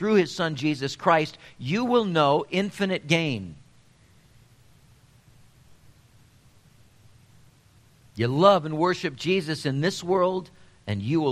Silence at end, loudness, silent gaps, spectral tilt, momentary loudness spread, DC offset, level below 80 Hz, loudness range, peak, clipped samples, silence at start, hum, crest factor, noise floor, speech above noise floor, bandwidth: 0 s; -24 LUFS; none; -6 dB/octave; 13 LU; under 0.1%; -62 dBFS; 7 LU; -2 dBFS; under 0.1%; 0 s; none; 24 dB; -57 dBFS; 33 dB; 13.5 kHz